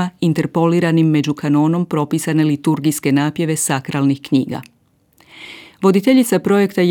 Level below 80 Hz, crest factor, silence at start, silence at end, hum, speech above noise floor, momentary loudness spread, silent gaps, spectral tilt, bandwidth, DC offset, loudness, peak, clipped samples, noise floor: -64 dBFS; 14 dB; 0 s; 0 s; none; 40 dB; 5 LU; none; -6 dB/octave; 19 kHz; under 0.1%; -16 LUFS; -2 dBFS; under 0.1%; -55 dBFS